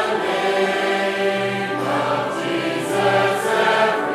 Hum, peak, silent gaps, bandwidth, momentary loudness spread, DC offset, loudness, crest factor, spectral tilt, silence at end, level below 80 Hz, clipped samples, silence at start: none; -6 dBFS; none; 15 kHz; 5 LU; under 0.1%; -19 LUFS; 14 dB; -4.5 dB/octave; 0 s; -66 dBFS; under 0.1%; 0 s